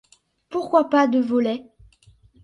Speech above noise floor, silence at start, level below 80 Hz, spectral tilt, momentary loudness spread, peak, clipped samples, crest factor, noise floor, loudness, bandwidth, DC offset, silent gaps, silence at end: 35 dB; 0.5 s; -60 dBFS; -6 dB/octave; 12 LU; -4 dBFS; under 0.1%; 18 dB; -55 dBFS; -21 LUFS; 10.5 kHz; under 0.1%; none; 0.8 s